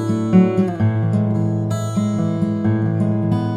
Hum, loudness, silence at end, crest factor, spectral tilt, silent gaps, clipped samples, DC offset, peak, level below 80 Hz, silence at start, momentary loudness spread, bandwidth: none; -18 LUFS; 0 s; 16 dB; -8.5 dB/octave; none; under 0.1%; under 0.1%; -2 dBFS; -50 dBFS; 0 s; 6 LU; 9.8 kHz